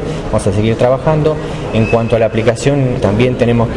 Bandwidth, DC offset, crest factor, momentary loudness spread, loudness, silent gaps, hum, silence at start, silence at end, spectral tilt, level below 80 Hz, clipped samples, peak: 11.5 kHz; under 0.1%; 10 dB; 4 LU; -13 LUFS; none; none; 0 s; 0 s; -7 dB/octave; -30 dBFS; under 0.1%; -2 dBFS